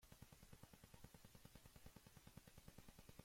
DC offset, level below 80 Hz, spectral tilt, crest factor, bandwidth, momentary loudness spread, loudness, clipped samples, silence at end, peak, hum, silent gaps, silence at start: under 0.1%; -72 dBFS; -4.5 dB/octave; 20 dB; 16.5 kHz; 1 LU; -66 LUFS; under 0.1%; 0 s; -44 dBFS; none; none; 0 s